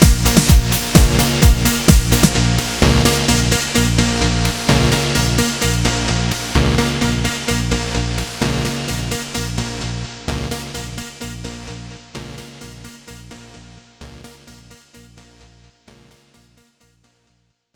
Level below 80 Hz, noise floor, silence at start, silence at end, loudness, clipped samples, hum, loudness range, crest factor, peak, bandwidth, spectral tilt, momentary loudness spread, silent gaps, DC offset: -24 dBFS; -64 dBFS; 0 s; 3.25 s; -16 LUFS; under 0.1%; none; 20 LU; 18 dB; 0 dBFS; over 20 kHz; -4 dB/octave; 20 LU; none; under 0.1%